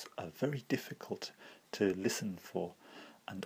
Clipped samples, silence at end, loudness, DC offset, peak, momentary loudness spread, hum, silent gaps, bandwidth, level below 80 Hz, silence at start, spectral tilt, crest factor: under 0.1%; 0 s; -39 LUFS; under 0.1%; -18 dBFS; 17 LU; none; none; 16 kHz; -78 dBFS; 0 s; -5 dB/octave; 20 dB